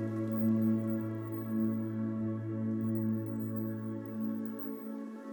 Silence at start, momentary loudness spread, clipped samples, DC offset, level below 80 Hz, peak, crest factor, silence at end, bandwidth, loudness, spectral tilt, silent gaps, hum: 0 s; 9 LU; under 0.1%; under 0.1%; -76 dBFS; -20 dBFS; 14 dB; 0 s; 19.5 kHz; -35 LUFS; -10.5 dB/octave; none; none